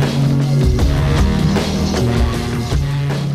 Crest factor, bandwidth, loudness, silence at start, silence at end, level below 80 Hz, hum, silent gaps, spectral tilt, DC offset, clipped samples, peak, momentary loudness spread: 12 dB; 14.5 kHz; -16 LUFS; 0 s; 0 s; -22 dBFS; none; none; -6.5 dB/octave; under 0.1%; under 0.1%; -4 dBFS; 4 LU